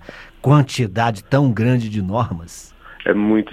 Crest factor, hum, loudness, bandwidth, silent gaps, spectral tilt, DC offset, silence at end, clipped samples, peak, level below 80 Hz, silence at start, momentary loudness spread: 18 dB; none; -18 LUFS; 13.5 kHz; none; -7 dB/octave; under 0.1%; 0 s; under 0.1%; 0 dBFS; -48 dBFS; 0.05 s; 16 LU